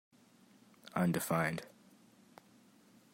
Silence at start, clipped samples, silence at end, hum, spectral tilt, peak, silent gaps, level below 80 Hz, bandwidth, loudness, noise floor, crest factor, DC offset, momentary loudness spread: 0.85 s; under 0.1%; 1.45 s; none; -5.5 dB/octave; -20 dBFS; none; -76 dBFS; 16 kHz; -36 LUFS; -65 dBFS; 22 dB; under 0.1%; 23 LU